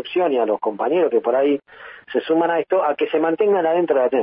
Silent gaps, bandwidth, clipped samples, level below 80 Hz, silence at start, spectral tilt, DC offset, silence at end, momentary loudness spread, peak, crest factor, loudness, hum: none; 5 kHz; under 0.1%; -72 dBFS; 0 s; -10 dB/octave; under 0.1%; 0 s; 8 LU; -6 dBFS; 12 dB; -19 LUFS; none